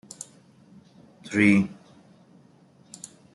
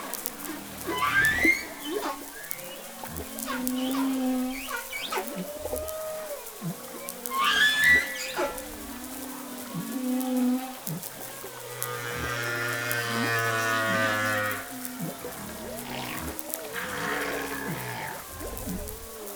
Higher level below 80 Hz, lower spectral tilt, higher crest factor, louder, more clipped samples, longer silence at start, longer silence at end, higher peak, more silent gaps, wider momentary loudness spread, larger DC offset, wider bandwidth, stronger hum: second, -68 dBFS vs -52 dBFS; first, -6 dB/octave vs -3 dB/octave; second, 22 dB vs 30 dB; first, -22 LUFS vs -29 LUFS; neither; first, 1.25 s vs 0 s; first, 1.6 s vs 0 s; second, -6 dBFS vs 0 dBFS; neither; first, 26 LU vs 15 LU; neither; second, 11.5 kHz vs over 20 kHz; neither